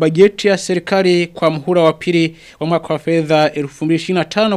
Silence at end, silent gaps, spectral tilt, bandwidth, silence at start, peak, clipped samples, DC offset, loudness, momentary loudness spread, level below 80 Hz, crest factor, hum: 0 s; none; -6 dB/octave; 12.5 kHz; 0 s; 0 dBFS; under 0.1%; under 0.1%; -15 LUFS; 7 LU; -54 dBFS; 14 dB; none